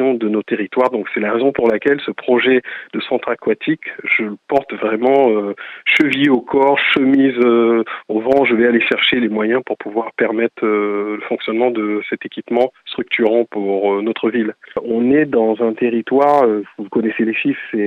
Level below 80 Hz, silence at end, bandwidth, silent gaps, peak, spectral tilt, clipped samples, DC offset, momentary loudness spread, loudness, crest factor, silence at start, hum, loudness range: -60 dBFS; 0 s; 7.4 kHz; none; -2 dBFS; -6.5 dB/octave; under 0.1%; under 0.1%; 9 LU; -16 LUFS; 14 dB; 0 s; none; 5 LU